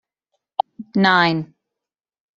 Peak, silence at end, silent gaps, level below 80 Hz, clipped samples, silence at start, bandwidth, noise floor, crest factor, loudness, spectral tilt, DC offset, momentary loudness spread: -2 dBFS; 0.9 s; none; -66 dBFS; under 0.1%; 0.8 s; 7.6 kHz; -86 dBFS; 20 dB; -19 LUFS; -6.5 dB/octave; under 0.1%; 14 LU